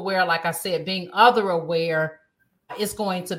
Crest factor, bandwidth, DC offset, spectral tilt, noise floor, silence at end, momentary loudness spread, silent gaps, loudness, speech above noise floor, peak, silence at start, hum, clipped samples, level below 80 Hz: 20 dB; 16.5 kHz; under 0.1%; -4 dB/octave; -53 dBFS; 0 s; 12 LU; none; -22 LUFS; 31 dB; -2 dBFS; 0 s; none; under 0.1%; -64 dBFS